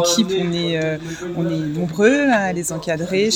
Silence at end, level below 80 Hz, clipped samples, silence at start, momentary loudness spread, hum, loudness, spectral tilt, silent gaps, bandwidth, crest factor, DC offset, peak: 0 s; -50 dBFS; under 0.1%; 0 s; 8 LU; none; -19 LUFS; -4.5 dB/octave; none; 17 kHz; 16 dB; under 0.1%; -2 dBFS